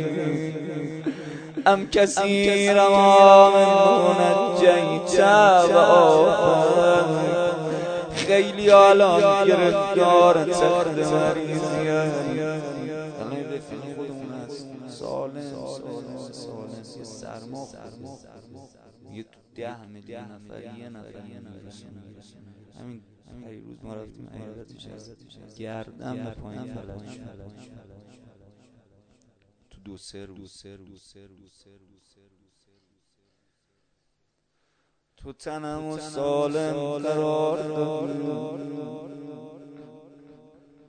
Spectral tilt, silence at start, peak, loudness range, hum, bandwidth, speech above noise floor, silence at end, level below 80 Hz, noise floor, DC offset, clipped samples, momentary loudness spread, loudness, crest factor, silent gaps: -5 dB/octave; 0 s; 0 dBFS; 26 LU; none; 9.4 kHz; 54 dB; 1.05 s; -58 dBFS; -74 dBFS; under 0.1%; under 0.1%; 26 LU; -19 LUFS; 22 dB; none